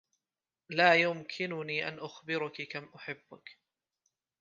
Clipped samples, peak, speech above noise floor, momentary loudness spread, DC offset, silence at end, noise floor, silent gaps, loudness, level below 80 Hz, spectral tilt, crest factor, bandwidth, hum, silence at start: under 0.1%; -8 dBFS; over 57 dB; 19 LU; under 0.1%; 0.9 s; under -90 dBFS; none; -31 LUFS; -84 dBFS; -5 dB/octave; 26 dB; 7.4 kHz; none; 0.7 s